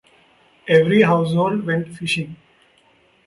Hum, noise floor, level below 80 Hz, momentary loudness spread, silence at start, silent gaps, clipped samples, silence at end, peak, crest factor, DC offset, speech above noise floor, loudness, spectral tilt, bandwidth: none; -57 dBFS; -60 dBFS; 10 LU; 0.65 s; none; under 0.1%; 0.9 s; -2 dBFS; 18 dB; under 0.1%; 39 dB; -18 LUFS; -6.5 dB/octave; 11.5 kHz